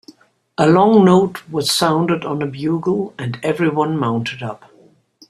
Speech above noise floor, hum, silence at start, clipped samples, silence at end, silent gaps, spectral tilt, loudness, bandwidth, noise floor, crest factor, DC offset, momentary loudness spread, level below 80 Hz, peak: 35 dB; none; 0.6 s; under 0.1%; 0.75 s; none; -5.5 dB/octave; -16 LUFS; 14.5 kHz; -51 dBFS; 16 dB; under 0.1%; 14 LU; -56 dBFS; -2 dBFS